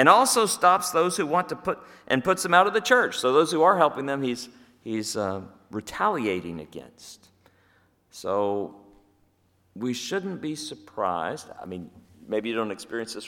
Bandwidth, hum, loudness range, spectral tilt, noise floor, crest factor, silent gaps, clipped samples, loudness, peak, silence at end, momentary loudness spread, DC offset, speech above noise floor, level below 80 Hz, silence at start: 18.5 kHz; none; 11 LU; -3.5 dB/octave; -65 dBFS; 24 dB; none; under 0.1%; -24 LUFS; -2 dBFS; 0 s; 19 LU; under 0.1%; 41 dB; -66 dBFS; 0 s